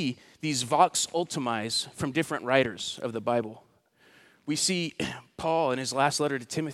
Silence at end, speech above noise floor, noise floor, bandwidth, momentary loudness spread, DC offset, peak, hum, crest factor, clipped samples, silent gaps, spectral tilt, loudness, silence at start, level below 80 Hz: 0 s; 34 dB; -62 dBFS; 16 kHz; 10 LU; under 0.1%; -6 dBFS; none; 22 dB; under 0.1%; none; -3.5 dB/octave; -28 LUFS; 0 s; -66 dBFS